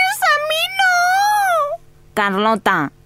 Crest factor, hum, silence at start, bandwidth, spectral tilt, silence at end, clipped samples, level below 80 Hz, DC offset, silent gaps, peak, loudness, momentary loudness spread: 14 dB; none; 0 s; 16 kHz; -2.5 dB/octave; 0.15 s; under 0.1%; -54 dBFS; under 0.1%; none; -2 dBFS; -16 LUFS; 7 LU